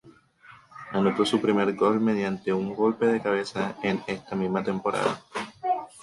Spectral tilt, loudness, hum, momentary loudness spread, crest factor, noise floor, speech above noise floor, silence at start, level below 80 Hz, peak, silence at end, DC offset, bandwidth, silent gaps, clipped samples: -6 dB/octave; -26 LUFS; none; 9 LU; 16 dB; -53 dBFS; 28 dB; 0.05 s; -64 dBFS; -10 dBFS; 0 s; under 0.1%; 11.5 kHz; none; under 0.1%